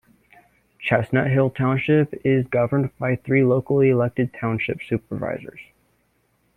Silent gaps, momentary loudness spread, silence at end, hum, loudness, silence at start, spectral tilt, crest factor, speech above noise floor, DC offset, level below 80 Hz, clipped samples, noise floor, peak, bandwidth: none; 10 LU; 0.95 s; none; -21 LUFS; 0.8 s; -9.5 dB/octave; 18 dB; 45 dB; under 0.1%; -56 dBFS; under 0.1%; -66 dBFS; -4 dBFS; 4 kHz